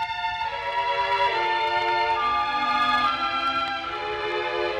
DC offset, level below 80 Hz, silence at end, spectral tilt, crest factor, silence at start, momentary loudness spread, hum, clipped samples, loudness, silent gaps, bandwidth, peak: under 0.1%; -54 dBFS; 0 s; -3.5 dB/octave; 14 dB; 0 s; 6 LU; none; under 0.1%; -24 LUFS; none; 12.5 kHz; -10 dBFS